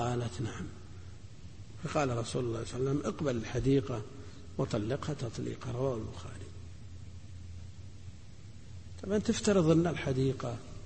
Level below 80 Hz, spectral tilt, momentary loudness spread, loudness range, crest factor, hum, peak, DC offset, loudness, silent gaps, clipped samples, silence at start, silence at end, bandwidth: -52 dBFS; -6.5 dB/octave; 21 LU; 9 LU; 18 dB; none; -16 dBFS; 0.3%; -33 LUFS; none; under 0.1%; 0 s; 0 s; 8.8 kHz